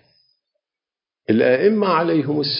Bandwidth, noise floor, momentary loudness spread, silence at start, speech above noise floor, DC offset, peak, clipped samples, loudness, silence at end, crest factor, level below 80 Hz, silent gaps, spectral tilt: 5.4 kHz; -90 dBFS; 5 LU; 1.3 s; 73 dB; under 0.1%; -4 dBFS; under 0.1%; -17 LUFS; 0 s; 16 dB; -66 dBFS; none; -10.5 dB/octave